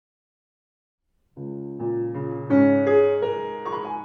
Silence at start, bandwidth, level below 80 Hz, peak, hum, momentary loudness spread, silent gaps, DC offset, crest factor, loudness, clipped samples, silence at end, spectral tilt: 1.35 s; 4.6 kHz; -70 dBFS; -8 dBFS; none; 16 LU; none; under 0.1%; 16 dB; -22 LUFS; under 0.1%; 0 s; -9.5 dB/octave